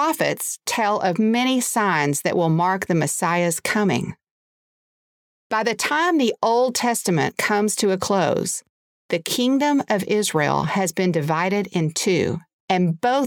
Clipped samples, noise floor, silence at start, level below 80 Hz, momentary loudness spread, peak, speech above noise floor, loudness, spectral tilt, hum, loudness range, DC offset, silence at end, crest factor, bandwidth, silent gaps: under 0.1%; under -90 dBFS; 0 s; -62 dBFS; 5 LU; -4 dBFS; over 70 dB; -21 LUFS; -4.5 dB/octave; none; 3 LU; under 0.1%; 0 s; 18 dB; over 20 kHz; 4.31-5.50 s, 8.69-9.09 s, 12.53-12.68 s